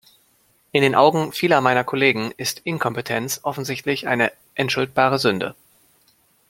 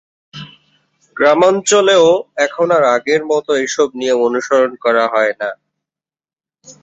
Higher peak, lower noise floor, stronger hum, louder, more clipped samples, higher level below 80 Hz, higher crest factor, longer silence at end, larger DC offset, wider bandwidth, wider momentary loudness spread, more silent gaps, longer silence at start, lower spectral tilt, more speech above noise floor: about the same, -2 dBFS vs 0 dBFS; second, -61 dBFS vs under -90 dBFS; neither; second, -20 LUFS vs -13 LUFS; neither; about the same, -62 dBFS vs -62 dBFS; first, 20 dB vs 14 dB; first, 1 s vs 0.1 s; neither; first, 16.5 kHz vs 8.2 kHz; second, 9 LU vs 13 LU; neither; first, 0.75 s vs 0.35 s; first, -4.5 dB/octave vs -3 dB/octave; second, 41 dB vs over 77 dB